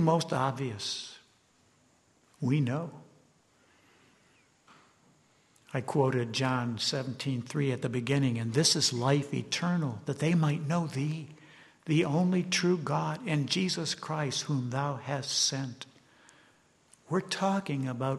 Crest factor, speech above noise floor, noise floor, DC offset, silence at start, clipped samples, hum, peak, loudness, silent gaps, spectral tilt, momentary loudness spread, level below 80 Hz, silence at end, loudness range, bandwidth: 20 dB; 37 dB; -66 dBFS; under 0.1%; 0 s; under 0.1%; none; -12 dBFS; -30 LUFS; none; -4.5 dB/octave; 9 LU; -70 dBFS; 0 s; 9 LU; 12.5 kHz